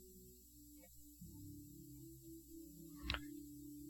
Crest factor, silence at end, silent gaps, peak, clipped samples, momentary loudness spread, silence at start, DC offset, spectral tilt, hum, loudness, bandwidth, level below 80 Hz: 30 dB; 0 s; none; -24 dBFS; under 0.1%; 15 LU; 0 s; under 0.1%; -4 dB/octave; none; -54 LUFS; 17.5 kHz; -62 dBFS